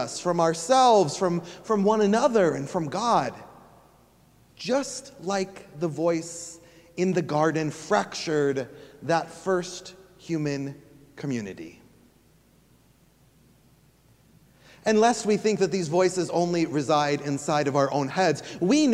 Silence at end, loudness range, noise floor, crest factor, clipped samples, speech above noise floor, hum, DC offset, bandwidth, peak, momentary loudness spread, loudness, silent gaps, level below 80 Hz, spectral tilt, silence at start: 0 s; 12 LU; -60 dBFS; 18 dB; under 0.1%; 35 dB; none; under 0.1%; 15 kHz; -8 dBFS; 15 LU; -25 LUFS; none; -66 dBFS; -5 dB/octave; 0 s